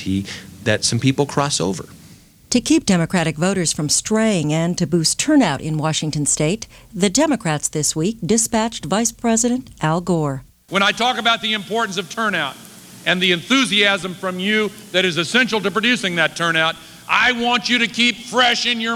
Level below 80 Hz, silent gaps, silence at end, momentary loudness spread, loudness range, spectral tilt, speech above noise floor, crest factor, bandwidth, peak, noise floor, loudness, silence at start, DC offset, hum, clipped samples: -50 dBFS; none; 0 s; 7 LU; 2 LU; -3.5 dB/octave; 27 dB; 16 dB; 19.5 kHz; -2 dBFS; -46 dBFS; -18 LUFS; 0 s; under 0.1%; none; under 0.1%